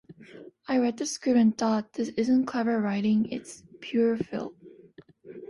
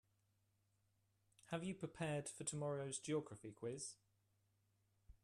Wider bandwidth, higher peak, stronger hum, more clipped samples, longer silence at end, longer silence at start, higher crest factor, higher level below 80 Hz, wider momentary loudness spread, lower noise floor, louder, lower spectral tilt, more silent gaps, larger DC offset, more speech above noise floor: second, 11.5 kHz vs 13.5 kHz; first, -12 dBFS vs -30 dBFS; neither; neither; about the same, 0.05 s vs 0.1 s; second, 0.1 s vs 1.45 s; about the same, 16 dB vs 20 dB; first, -68 dBFS vs -78 dBFS; first, 19 LU vs 7 LU; second, -53 dBFS vs -82 dBFS; first, -27 LUFS vs -47 LUFS; about the same, -5.5 dB/octave vs -4.5 dB/octave; neither; neither; second, 27 dB vs 36 dB